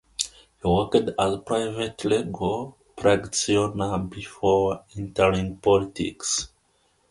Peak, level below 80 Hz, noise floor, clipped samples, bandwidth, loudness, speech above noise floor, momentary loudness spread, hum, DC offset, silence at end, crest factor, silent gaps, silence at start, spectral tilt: -2 dBFS; -46 dBFS; -66 dBFS; under 0.1%; 11.5 kHz; -24 LUFS; 42 dB; 9 LU; none; under 0.1%; 0.65 s; 22 dB; none; 0.2 s; -4.5 dB/octave